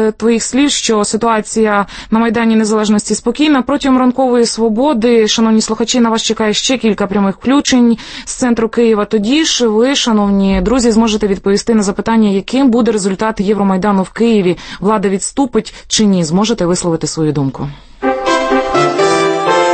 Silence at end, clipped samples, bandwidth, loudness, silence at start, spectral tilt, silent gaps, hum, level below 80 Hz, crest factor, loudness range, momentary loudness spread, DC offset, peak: 0 s; under 0.1%; 8.8 kHz; -12 LUFS; 0 s; -4.5 dB/octave; none; none; -36 dBFS; 12 dB; 2 LU; 5 LU; under 0.1%; 0 dBFS